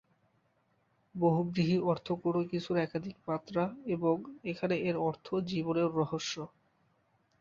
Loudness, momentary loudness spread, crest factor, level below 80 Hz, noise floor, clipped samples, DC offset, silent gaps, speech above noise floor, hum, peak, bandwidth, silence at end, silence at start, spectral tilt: -33 LUFS; 8 LU; 18 dB; -70 dBFS; -74 dBFS; under 0.1%; under 0.1%; none; 41 dB; none; -16 dBFS; 7.4 kHz; 0.95 s; 1.15 s; -6.5 dB/octave